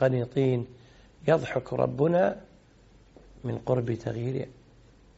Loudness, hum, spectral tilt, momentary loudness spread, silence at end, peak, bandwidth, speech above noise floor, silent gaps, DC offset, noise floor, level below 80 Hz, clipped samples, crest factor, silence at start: -28 LUFS; none; -7.5 dB/octave; 13 LU; 0.65 s; -8 dBFS; 8 kHz; 30 dB; none; under 0.1%; -57 dBFS; -58 dBFS; under 0.1%; 20 dB; 0 s